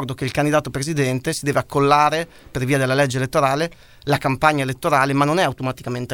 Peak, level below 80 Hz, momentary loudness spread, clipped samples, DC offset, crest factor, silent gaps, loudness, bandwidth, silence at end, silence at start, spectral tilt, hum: 0 dBFS; -48 dBFS; 9 LU; under 0.1%; 0.2%; 20 dB; none; -19 LUFS; 17.5 kHz; 0 s; 0 s; -5.5 dB/octave; none